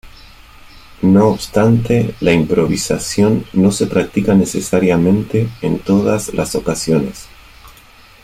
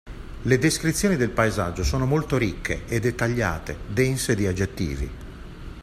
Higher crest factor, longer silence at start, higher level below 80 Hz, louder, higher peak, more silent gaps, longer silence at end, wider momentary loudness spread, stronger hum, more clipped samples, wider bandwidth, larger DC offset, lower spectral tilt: about the same, 14 dB vs 18 dB; about the same, 0.05 s vs 0.05 s; about the same, -40 dBFS vs -36 dBFS; first, -15 LUFS vs -24 LUFS; first, -2 dBFS vs -6 dBFS; neither; first, 0.55 s vs 0 s; second, 6 LU vs 12 LU; neither; neither; about the same, 15.5 kHz vs 15.5 kHz; neither; about the same, -6 dB/octave vs -5.5 dB/octave